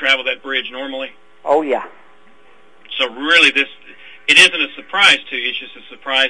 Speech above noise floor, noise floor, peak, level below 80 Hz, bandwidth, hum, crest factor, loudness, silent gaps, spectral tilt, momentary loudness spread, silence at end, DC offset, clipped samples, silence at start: 35 dB; -50 dBFS; 0 dBFS; -62 dBFS; 12 kHz; none; 18 dB; -14 LUFS; none; -0.5 dB/octave; 19 LU; 0 s; 0.7%; under 0.1%; 0 s